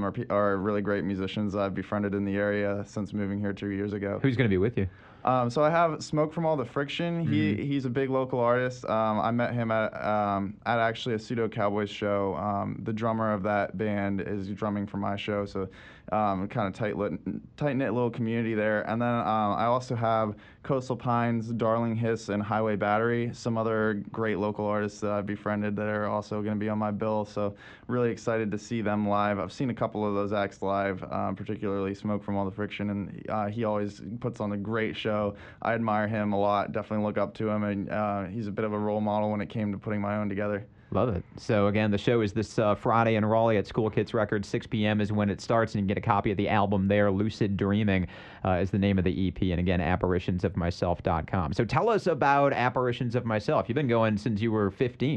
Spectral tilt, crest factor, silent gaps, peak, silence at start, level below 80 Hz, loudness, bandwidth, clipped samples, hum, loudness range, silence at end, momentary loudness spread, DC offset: -7.5 dB/octave; 20 dB; none; -8 dBFS; 0 s; -54 dBFS; -28 LUFS; 8.8 kHz; under 0.1%; none; 4 LU; 0 s; 7 LU; under 0.1%